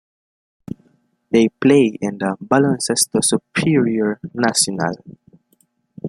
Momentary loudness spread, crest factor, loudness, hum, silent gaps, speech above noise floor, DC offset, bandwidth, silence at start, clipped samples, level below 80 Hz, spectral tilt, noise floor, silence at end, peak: 17 LU; 18 dB; -17 LUFS; none; none; 45 dB; under 0.1%; 14.5 kHz; 1.3 s; under 0.1%; -58 dBFS; -4 dB/octave; -62 dBFS; 0 s; 0 dBFS